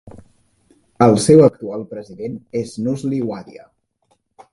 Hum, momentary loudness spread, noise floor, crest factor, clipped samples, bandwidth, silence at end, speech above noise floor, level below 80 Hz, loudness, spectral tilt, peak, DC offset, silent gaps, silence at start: none; 19 LU; -65 dBFS; 18 dB; under 0.1%; 11.5 kHz; 1.05 s; 48 dB; -54 dBFS; -16 LUFS; -6.5 dB/octave; 0 dBFS; under 0.1%; none; 0.05 s